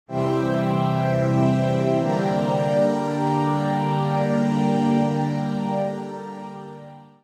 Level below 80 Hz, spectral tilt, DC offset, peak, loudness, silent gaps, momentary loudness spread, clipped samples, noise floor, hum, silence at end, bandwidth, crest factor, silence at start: -58 dBFS; -8 dB/octave; under 0.1%; -8 dBFS; -22 LUFS; none; 13 LU; under 0.1%; -42 dBFS; none; 0.2 s; 11.5 kHz; 14 dB; 0.1 s